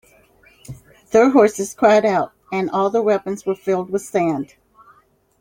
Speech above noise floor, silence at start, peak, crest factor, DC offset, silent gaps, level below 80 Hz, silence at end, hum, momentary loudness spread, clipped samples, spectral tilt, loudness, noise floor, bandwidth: 39 dB; 0.7 s; -2 dBFS; 18 dB; under 0.1%; none; -58 dBFS; 0.95 s; none; 12 LU; under 0.1%; -5.5 dB/octave; -18 LUFS; -56 dBFS; 16.5 kHz